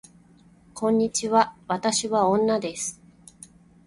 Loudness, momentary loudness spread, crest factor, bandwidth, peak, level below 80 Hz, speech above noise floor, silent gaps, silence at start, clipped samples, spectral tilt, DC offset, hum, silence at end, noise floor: -24 LUFS; 10 LU; 20 dB; 11.5 kHz; -6 dBFS; -62 dBFS; 32 dB; none; 0.75 s; under 0.1%; -3.5 dB/octave; under 0.1%; none; 0.95 s; -55 dBFS